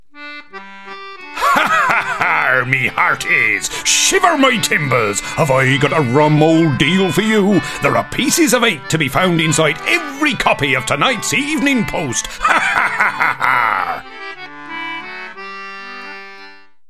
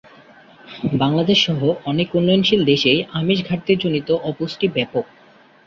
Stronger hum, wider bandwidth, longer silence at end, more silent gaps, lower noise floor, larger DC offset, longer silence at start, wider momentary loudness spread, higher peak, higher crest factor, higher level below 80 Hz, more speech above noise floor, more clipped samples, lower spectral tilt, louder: neither; first, 14 kHz vs 7.4 kHz; second, 0.4 s vs 0.65 s; neither; second, -41 dBFS vs -49 dBFS; first, 0.9% vs under 0.1%; second, 0.15 s vs 0.65 s; first, 17 LU vs 10 LU; first, 0 dBFS vs -4 dBFS; about the same, 16 dB vs 16 dB; first, -44 dBFS vs -54 dBFS; second, 27 dB vs 31 dB; neither; second, -3.5 dB/octave vs -6 dB/octave; first, -14 LUFS vs -18 LUFS